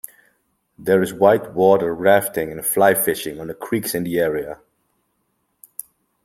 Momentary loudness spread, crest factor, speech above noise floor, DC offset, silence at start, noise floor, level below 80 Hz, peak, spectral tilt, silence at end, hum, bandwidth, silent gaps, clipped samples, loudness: 19 LU; 20 dB; 51 dB; under 0.1%; 0.8 s; -70 dBFS; -58 dBFS; 0 dBFS; -4.5 dB/octave; 1.7 s; none; 16.5 kHz; none; under 0.1%; -18 LUFS